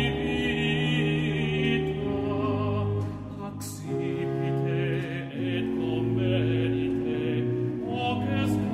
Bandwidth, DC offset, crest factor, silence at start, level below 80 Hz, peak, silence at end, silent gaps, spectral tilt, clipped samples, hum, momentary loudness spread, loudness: 14.5 kHz; under 0.1%; 14 dB; 0 s; -48 dBFS; -12 dBFS; 0 s; none; -7 dB/octave; under 0.1%; none; 6 LU; -28 LUFS